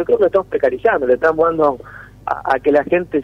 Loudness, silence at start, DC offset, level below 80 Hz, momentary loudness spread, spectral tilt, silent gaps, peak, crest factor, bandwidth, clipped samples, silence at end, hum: -16 LUFS; 0 s; under 0.1%; -46 dBFS; 9 LU; -7.5 dB/octave; none; -2 dBFS; 14 dB; 6.2 kHz; under 0.1%; 0 s; none